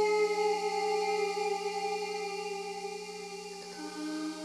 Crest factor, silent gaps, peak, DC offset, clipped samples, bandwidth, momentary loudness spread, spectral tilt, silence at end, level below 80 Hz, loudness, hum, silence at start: 14 dB; none; -20 dBFS; under 0.1%; under 0.1%; 13.5 kHz; 12 LU; -3 dB/octave; 0 s; -88 dBFS; -34 LUFS; none; 0 s